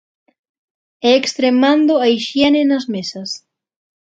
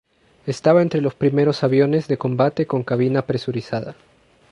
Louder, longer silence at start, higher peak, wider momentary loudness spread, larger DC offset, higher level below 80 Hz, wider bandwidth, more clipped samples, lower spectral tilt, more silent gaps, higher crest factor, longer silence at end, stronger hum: first, -15 LUFS vs -19 LUFS; first, 1.05 s vs 0.45 s; about the same, 0 dBFS vs -2 dBFS; about the same, 13 LU vs 11 LU; neither; about the same, -60 dBFS vs -58 dBFS; second, 8.2 kHz vs 11 kHz; neither; second, -4 dB/octave vs -8 dB/octave; neither; about the same, 16 dB vs 18 dB; about the same, 0.7 s vs 0.6 s; neither